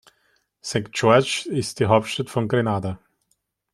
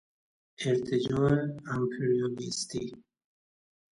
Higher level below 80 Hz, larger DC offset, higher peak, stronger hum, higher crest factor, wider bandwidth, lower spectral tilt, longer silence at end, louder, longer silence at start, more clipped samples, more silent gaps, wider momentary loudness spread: about the same, -58 dBFS vs -62 dBFS; neither; first, -2 dBFS vs -14 dBFS; neither; about the same, 20 dB vs 18 dB; first, 13.5 kHz vs 11.5 kHz; about the same, -5 dB/octave vs -5.5 dB/octave; second, 0.75 s vs 0.95 s; first, -22 LUFS vs -30 LUFS; about the same, 0.65 s vs 0.6 s; neither; neither; first, 12 LU vs 9 LU